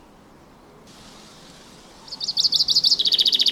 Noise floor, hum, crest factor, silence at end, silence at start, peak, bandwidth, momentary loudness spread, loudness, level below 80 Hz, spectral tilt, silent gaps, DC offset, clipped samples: -49 dBFS; none; 18 dB; 0 s; 1.05 s; -6 dBFS; 17 kHz; 12 LU; -17 LUFS; -58 dBFS; 0.5 dB/octave; none; under 0.1%; under 0.1%